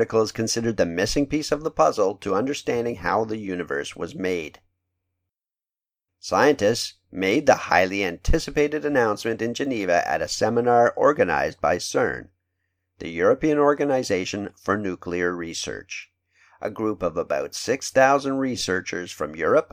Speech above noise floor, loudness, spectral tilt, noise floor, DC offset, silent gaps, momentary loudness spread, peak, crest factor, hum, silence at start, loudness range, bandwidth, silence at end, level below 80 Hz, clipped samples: over 67 dB; -23 LUFS; -4.5 dB/octave; under -90 dBFS; under 0.1%; none; 11 LU; -2 dBFS; 22 dB; none; 0 s; 6 LU; 16 kHz; 0.1 s; -40 dBFS; under 0.1%